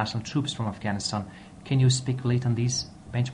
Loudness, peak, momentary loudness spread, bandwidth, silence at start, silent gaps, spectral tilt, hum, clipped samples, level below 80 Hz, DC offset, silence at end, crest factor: -27 LUFS; -10 dBFS; 10 LU; 10 kHz; 0 s; none; -5 dB/octave; none; under 0.1%; -54 dBFS; under 0.1%; 0 s; 16 dB